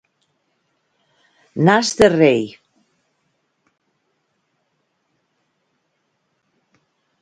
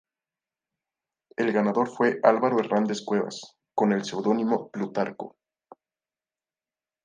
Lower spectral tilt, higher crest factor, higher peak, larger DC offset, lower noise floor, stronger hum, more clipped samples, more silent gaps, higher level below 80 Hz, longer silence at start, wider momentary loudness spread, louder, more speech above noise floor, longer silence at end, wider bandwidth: about the same, -5 dB/octave vs -6 dB/octave; about the same, 22 dB vs 24 dB; about the same, 0 dBFS vs -2 dBFS; neither; second, -70 dBFS vs under -90 dBFS; neither; neither; neither; first, -54 dBFS vs -78 dBFS; first, 1.55 s vs 1.4 s; first, 17 LU vs 13 LU; first, -15 LUFS vs -25 LUFS; second, 56 dB vs over 65 dB; first, 4.75 s vs 1.75 s; first, 11.5 kHz vs 9.6 kHz